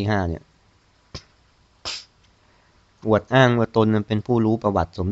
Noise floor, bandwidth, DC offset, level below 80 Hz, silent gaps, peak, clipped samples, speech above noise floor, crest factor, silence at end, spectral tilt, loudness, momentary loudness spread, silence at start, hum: -59 dBFS; 8 kHz; under 0.1%; -50 dBFS; none; -2 dBFS; under 0.1%; 39 dB; 20 dB; 0 s; -7 dB/octave; -21 LUFS; 23 LU; 0 s; none